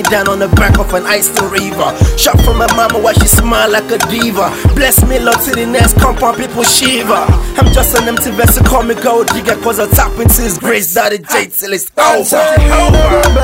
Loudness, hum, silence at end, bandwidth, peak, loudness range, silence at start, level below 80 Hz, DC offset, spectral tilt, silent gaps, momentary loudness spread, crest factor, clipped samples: -10 LUFS; none; 0 s; 16.5 kHz; 0 dBFS; 1 LU; 0 s; -16 dBFS; under 0.1%; -4 dB/octave; none; 5 LU; 10 dB; 0.2%